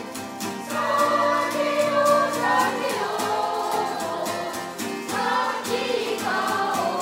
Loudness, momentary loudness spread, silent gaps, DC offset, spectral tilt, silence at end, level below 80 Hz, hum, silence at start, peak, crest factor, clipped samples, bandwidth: -24 LUFS; 10 LU; none; under 0.1%; -3 dB/octave; 0 s; -68 dBFS; none; 0 s; -8 dBFS; 16 dB; under 0.1%; 16 kHz